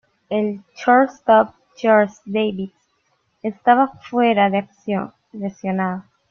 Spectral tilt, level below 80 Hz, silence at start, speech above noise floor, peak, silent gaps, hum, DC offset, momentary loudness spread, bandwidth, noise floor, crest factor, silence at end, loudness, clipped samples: -7 dB/octave; -64 dBFS; 0.3 s; 48 dB; -2 dBFS; none; none; under 0.1%; 14 LU; 7 kHz; -66 dBFS; 18 dB; 0.3 s; -19 LUFS; under 0.1%